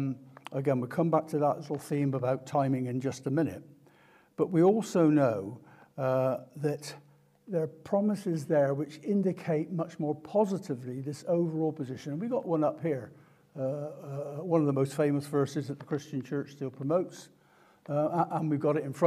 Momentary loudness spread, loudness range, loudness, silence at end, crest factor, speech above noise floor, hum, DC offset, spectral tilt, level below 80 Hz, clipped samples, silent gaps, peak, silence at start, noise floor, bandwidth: 11 LU; 4 LU; -31 LUFS; 0 s; 18 dB; 33 dB; none; under 0.1%; -8 dB/octave; -80 dBFS; under 0.1%; none; -12 dBFS; 0 s; -62 dBFS; 14.5 kHz